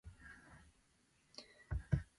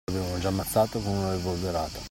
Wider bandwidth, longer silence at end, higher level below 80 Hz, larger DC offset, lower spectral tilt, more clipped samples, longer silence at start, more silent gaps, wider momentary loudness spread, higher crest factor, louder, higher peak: second, 11.5 kHz vs 16.5 kHz; first, 0.15 s vs 0 s; second, -52 dBFS vs -46 dBFS; neither; first, -7 dB/octave vs -5.5 dB/octave; neither; about the same, 0.05 s vs 0.1 s; neither; first, 22 LU vs 5 LU; first, 26 dB vs 16 dB; second, -47 LUFS vs -28 LUFS; second, -22 dBFS vs -12 dBFS